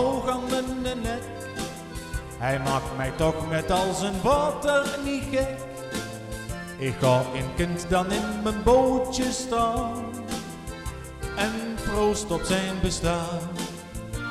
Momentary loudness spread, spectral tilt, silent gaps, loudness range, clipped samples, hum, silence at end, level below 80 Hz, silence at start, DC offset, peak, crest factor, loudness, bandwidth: 12 LU; -5 dB/octave; none; 4 LU; under 0.1%; none; 0 s; -40 dBFS; 0 s; under 0.1%; -8 dBFS; 18 dB; -27 LUFS; 15.5 kHz